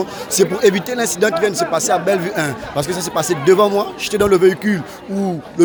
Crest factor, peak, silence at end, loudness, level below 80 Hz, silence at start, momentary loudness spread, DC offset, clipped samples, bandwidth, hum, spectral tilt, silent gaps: 16 dB; 0 dBFS; 0 s; -16 LUFS; -48 dBFS; 0 s; 9 LU; under 0.1%; under 0.1%; over 20 kHz; none; -4 dB/octave; none